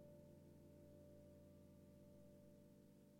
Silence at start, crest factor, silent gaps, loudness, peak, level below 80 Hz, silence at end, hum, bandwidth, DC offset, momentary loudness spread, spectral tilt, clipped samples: 0 s; 12 dB; none; -66 LUFS; -54 dBFS; -82 dBFS; 0 s; none; 16.5 kHz; under 0.1%; 2 LU; -7.5 dB/octave; under 0.1%